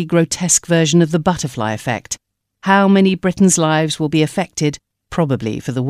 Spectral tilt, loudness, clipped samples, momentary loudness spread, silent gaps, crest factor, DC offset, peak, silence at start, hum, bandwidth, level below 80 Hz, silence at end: -4.5 dB/octave; -16 LUFS; under 0.1%; 11 LU; none; 16 dB; under 0.1%; 0 dBFS; 0 s; none; 14.5 kHz; -48 dBFS; 0 s